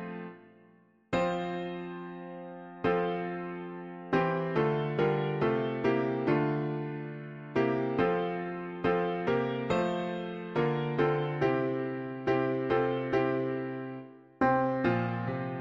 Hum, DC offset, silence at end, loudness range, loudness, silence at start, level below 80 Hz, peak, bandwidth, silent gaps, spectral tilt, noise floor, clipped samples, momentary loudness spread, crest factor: none; under 0.1%; 0 s; 4 LU; -31 LUFS; 0 s; -62 dBFS; -14 dBFS; 7.4 kHz; none; -8 dB/octave; -62 dBFS; under 0.1%; 12 LU; 16 dB